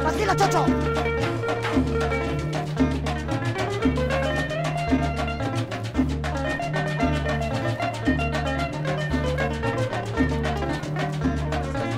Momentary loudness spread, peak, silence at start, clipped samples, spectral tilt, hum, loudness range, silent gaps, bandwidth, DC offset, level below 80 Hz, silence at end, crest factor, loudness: 4 LU; -8 dBFS; 0 s; under 0.1%; -6 dB/octave; none; 2 LU; none; 15 kHz; under 0.1%; -34 dBFS; 0 s; 16 dB; -25 LUFS